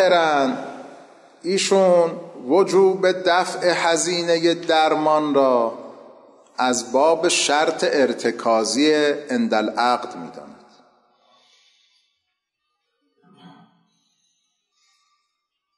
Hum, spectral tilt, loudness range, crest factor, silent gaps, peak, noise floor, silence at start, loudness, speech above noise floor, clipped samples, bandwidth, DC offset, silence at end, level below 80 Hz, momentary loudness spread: none; -3 dB/octave; 6 LU; 14 dB; none; -6 dBFS; -77 dBFS; 0 s; -19 LUFS; 59 dB; under 0.1%; 11.5 kHz; under 0.1%; 2.3 s; -76 dBFS; 15 LU